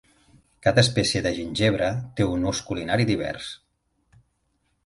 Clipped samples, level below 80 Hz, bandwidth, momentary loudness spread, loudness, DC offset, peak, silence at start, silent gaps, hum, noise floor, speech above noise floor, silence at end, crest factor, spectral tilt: under 0.1%; -46 dBFS; 11.5 kHz; 11 LU; -24 LUFS; under 0.1%; -4 dBFS; 0.65 s; none; none; -71 dBFS; 48 dB; 1.3 s; 20 dB; -5 dB/octave